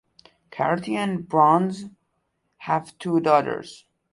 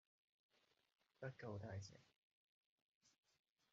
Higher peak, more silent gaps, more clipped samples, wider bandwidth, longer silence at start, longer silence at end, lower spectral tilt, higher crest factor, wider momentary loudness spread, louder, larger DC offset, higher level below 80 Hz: first, -4 dBFS vs -38 dBFS; second, none vs 2.18-3.01 s; neither; first, 11.5 kHz vs 7.4 kHz; second, 0.55 s vs 1.2 s; second, 0.35 s vs 0.65 s; about the same, -6.5 dB/octave vs -6 dB/octave; about the same, 20 dB vs 22 dB; first, 21 LU vs 5 LU; first, -22 LUFS vs -55 LUFS; neither; first, -66 dBFS vs -86 dBFS